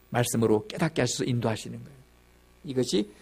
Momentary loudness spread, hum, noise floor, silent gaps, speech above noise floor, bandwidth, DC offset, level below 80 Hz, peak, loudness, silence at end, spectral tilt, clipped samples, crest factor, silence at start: 14 LU; 60 Hz at -50 dBFS; -58 dBFS; none; 31 dB; 15.5 kHz; under 0.1%; -58 dBFS; -8 dBFS; -27 LUFS; 0.1 s; -5 dB/octave; under 0.1%; 20 dB; 0.1 s